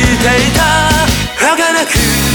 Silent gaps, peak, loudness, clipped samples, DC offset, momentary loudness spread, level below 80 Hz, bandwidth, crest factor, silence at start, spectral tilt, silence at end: none; 0 dBFS; -10 LUFS; under 0.1%; under 0.1%; 2 LU; -22 dBFS; over 20 kHz; 10 dB; 0 s; -3.5 dB/octave; 0 s